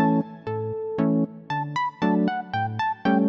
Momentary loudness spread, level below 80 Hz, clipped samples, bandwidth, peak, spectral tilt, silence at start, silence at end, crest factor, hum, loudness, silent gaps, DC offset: 7 LU; -64 dBFS; under 0.1%; 7.4 kHz; -10 dBFS; -8 dB/octave; 0 s; 0 s; 14 dB; none; -26 LUFS; none; under 0.1%